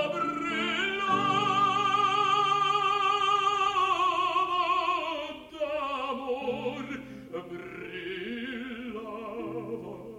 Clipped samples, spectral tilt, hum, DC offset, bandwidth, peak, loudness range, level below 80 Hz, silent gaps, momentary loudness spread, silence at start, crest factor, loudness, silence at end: under 0.1%; -3.5 dB/octave; none; under 0.1%; 12.5 kHz; -14 dBFS; 12 LU; -64 dBFS; none; 14 LU; 0 s; 14 dB; -28 LUFS; 0 s